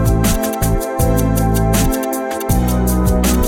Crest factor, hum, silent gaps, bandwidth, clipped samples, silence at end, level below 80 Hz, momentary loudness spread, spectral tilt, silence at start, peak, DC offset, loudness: 12 dB; none; none; 18.5 kHz; under 0.1%; 0 s; -20 dBFS; 3 LU; -5.5 dB/octave; 0 s; -2 dBFS; under 0.1%; -16 LUFS